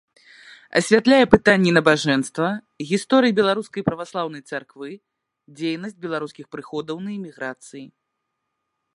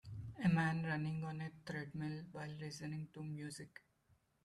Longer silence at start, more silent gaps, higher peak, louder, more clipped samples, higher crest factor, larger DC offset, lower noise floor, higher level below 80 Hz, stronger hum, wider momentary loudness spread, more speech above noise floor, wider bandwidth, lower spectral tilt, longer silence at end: first, 0.45 s vs 0.05 s; neither; first, 0 dBFS vs -24 dBFS; first, -20 LUFS vs -42 LUFS; neither; about the same, 22 dB vs 18 dB; neither; about the same, -78 dBFS vs -76 dBFS; first, -54 dBFS vs -70 dBFS; neither; first, 19 LU vs 14 LU; first, 57 dB vs 33 dB; about the same, 11.5 kHz vs 12 kHz; second, -5 dB/octave vs -6.5 dB/octave; first, 1.1 s vs 0.75 s